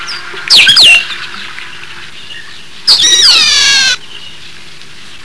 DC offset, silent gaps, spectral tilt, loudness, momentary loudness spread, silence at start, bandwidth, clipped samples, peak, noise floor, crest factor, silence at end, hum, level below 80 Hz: 5%; none; 2 dB/octave; -4 LUFS; 25 LU; 0 s; 11 kHz; 2%; 0 dBFS; -33 dBFS; 10 dB; 0.1 s; none; -46 dBFS